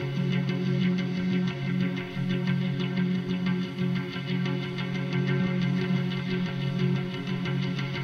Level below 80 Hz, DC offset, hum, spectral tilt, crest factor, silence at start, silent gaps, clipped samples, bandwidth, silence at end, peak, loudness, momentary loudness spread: -60 dBFS; under 0.1%; none; -7.5 dB/octave; 12 dB; 0 s; none; under 0.1%; 6.6 kHz; 0 s; -14 dBFS; -28 LUFS; 4 LU